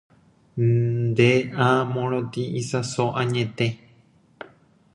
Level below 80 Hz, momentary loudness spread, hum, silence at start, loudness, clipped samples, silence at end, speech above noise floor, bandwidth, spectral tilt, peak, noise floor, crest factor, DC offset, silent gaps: -58 dBFS; 23 LU; none; 0.55 s; -23 LUFS; under 0.1%; 1.2 s; 35 dB; 11 kHz; -6.5 dB/octave; -4 dBFS; -57 dBFS; 20 dB; under 0.1%; none